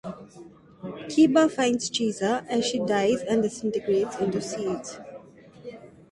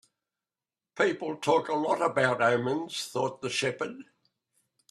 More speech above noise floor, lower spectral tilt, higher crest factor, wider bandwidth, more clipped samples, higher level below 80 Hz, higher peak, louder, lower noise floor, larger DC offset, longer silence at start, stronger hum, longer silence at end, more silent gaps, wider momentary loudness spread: second, 23 dB vs over 62 dB; about the same, -4.5 dB/octave vs -4 dB/octave; about the same, 18 dB vs 20 dB; second, 11.5 kHz vs 13.5 kHz; neither; first, -64 dBFS vs -74 dBFS; about the same, -8 dBFS vs -10 dBFS; first, -25 LUFS vs -28 LUFS; second, -48 dBFS vs under -90 dBFS; neither; second, 0.05 s vs 0.95 s; neither; second, 0.25 s vs 0.9 s; neither; first, 22 LU vs 8 LU